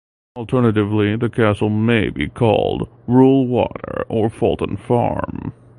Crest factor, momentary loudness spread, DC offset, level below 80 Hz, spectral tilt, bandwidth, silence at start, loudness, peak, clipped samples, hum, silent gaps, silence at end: 16 dB; 11 LU; under 0.1%; -40 dBFS; -8.5 dB/octave; 11 kHz; 0.35 s; -18 LUFS; 0 dBFS; under 0.1%; none; none; 0.3 s